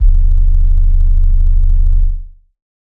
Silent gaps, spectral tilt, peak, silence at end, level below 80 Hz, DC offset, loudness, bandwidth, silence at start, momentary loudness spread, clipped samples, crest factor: none; -9.5 dB/octave; 0 dBFS; 0.7 s; -10 dBFS; under 0.1%; -16 LUFS; 0.4 kHz; 0 s; 3 LU; under 0.1%; 8 dB